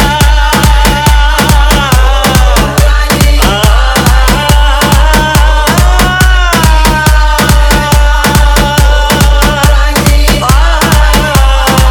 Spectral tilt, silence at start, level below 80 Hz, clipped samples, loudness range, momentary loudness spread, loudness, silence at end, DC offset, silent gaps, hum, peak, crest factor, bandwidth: -4 dB/octave; 0 s; -8 dBFS; 0.8%; 0 LU; 1 LU; -7 LUFS; 0 s; under 0.1%; none; none; 0 dBFS; 6 dB; 20 kHz